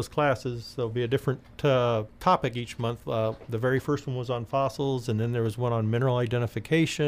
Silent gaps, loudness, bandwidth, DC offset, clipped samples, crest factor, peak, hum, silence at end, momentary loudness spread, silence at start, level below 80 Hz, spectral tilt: none; -28 LUFS; 15.5 kHz; under 0.1%; under 0.1%; 16 dB; -10 dBFS; none; 0 s; 7 LU; 0 s; -54 dBFS; -6.5 dB/octave